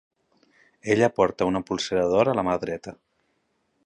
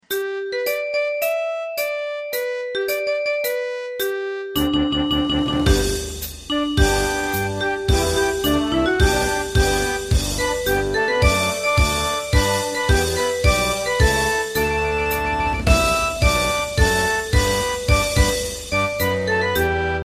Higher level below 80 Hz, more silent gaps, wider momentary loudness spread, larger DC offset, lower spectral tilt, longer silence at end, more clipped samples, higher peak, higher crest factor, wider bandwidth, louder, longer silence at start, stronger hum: second, -56 dBFS vs -26 dBFS; neither; first, 14 LU vs 7 LU; neither; first, -5.5 dB/octave vs -4 dB/octave; first, 0.9 s vs 0 s; neither; second, -6 dBFS vs -2 dBFS; about the same, 20 dB vs 18 dB; second, 10.5 kHz vs 15.5 kHz; second, -23 LUFS vs -20 LUFS; first, 0.85 s vs 0.1 s; neither